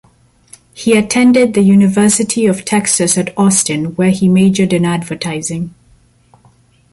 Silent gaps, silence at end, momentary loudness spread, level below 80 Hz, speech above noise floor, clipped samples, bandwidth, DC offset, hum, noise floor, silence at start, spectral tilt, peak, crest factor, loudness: none; 1.25 s; 10 LU; -48 dBFS; 39 dB; under 0.1%; 11.5 kHz; under 0.1%; none; -50 dBFS; 0.75 s; -5 dB/octave; 0 dBFS; 12 dB; -12 LUFS